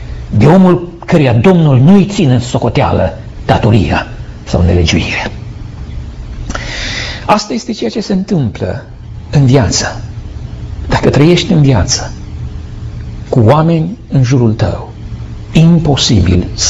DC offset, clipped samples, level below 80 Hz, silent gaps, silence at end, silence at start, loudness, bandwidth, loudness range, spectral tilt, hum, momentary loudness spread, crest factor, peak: under 0.1%; under 0.1%; -26 dBFS; none; 0 s; 0 s; -10 LUFS; 8 kHz; 7 LU; -6 dB/octave; none; 18 LU; 10 dB; 0 dBFS